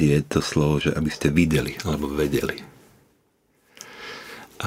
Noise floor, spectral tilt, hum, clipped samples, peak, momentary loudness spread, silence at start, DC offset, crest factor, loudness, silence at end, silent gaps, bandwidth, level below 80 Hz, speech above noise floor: -65 dBFS; -6 dB/octave; none; under 0.1%; -4 dBFS; 18 LU; 0 s; under 0.1%; 20 dB; -23 LUFS; 0 s; none; 16 kHz; -40 dBFS; 43 dB